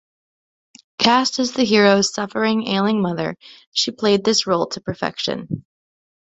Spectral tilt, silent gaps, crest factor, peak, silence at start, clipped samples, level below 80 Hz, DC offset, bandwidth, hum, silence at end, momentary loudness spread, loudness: -4 dB/octave; 3.67-3.72 s; 18 dB; -2 dBFS; 1 s; under 0.1%; -58 dBFS; under 0.1%; 8.4 kHz; none; 0.8 s; 13 LU; -19 LUFS